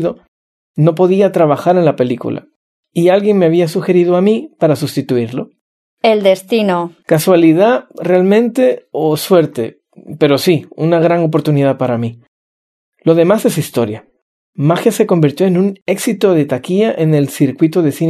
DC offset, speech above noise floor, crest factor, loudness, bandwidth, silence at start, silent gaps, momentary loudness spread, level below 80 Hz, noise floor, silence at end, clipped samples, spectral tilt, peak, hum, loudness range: under 0.1%; over 78 dB; 12 dB; -13 LUFS; 13.5 kHz; 0 s; 0.28-0.74 s, 2.56-2.83 s, 5.61-5.97 s, 12.28-12.92 s, 14.22-14.53 s, 15.82-15.86 s; 9 LU; -62 dBFS; under -90 dBFS; 0 s; under 0.1%; -6.5 dB/octave; 0 dBFS; none; 3 LU